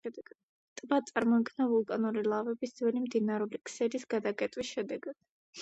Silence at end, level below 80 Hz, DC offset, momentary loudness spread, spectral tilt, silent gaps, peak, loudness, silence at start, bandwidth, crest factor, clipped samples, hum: 0 s; -76 dBFS; under 0.1%; 15 LU; -5.5 dB/octave; 0.43-0.76 s, 5.30-5.53 s; -14 dBFS; -33 LUFS; 0.05 s; 8.2 kHz; 20 dB; under 0.1%; none